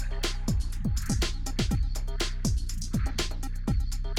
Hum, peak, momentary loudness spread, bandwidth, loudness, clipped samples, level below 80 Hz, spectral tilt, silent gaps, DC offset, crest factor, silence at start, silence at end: none; -14 dBFS; 3 LU; 15.5 kHz; -31 LUFS; under 0.1%; -30 dBFS; -4.5 dB/octave; none; under 0.1%; 14 dB; 0 s; 0 s